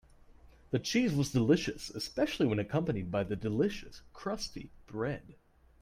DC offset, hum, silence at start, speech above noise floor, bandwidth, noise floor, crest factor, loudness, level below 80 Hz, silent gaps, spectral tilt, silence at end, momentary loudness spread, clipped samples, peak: under 0.1%; none; 0.3 s; 25 dB; 16 kHz; -58 dBFS; 20 dB; -33 LUFS; -56 dBFS; none; -6 dB/octave; 0.5 s; 14 LU; under 0.1%; -14 dBFS